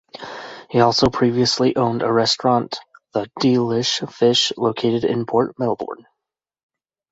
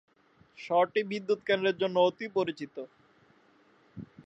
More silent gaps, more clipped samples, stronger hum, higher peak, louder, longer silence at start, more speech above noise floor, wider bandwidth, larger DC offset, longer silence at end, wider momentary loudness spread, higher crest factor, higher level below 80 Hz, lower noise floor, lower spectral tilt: neither; neither; neither; first, -2 dBFS vs -12 dBFS; first, -19 LUFS vs -29 LUFS; second, 0.15 s vs 0.6 s; first, 66 dB vs 35 dB; about the same, 8 kHz vs 8 kHz; neither; first, 1.2 s vs 0.05 s; second, 16 LU vs 22 LU; about the same, 18 dB vs 20 dB; first, -50 dBFS vs -74 dBFS; first, -84 dBFS vs -63 dBFS; about the same, -5 dB/octave vs -6 dB/octave